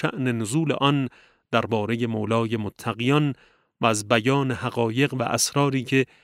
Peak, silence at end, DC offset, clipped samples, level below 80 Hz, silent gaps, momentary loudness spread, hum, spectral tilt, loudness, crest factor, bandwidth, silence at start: -2 dBFS; 0.2 s; under 0.1%; under 0.1%; -64 dBFS; none; 6 LU; none; -5 dB/octave; -23 LUFS; 22 dB; 16 kHz; 0 s